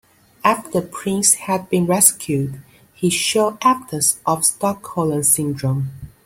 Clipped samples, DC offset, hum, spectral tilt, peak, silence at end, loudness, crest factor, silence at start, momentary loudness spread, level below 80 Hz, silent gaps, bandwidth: under 0.1%; under 0.1%; none; -3.5 dB/octave; 0 dBFS; 0.2 s; -17 LUFS; 20 dB; 0.45 s; 10 LU; -54 dBFS; none; 16.5 kHz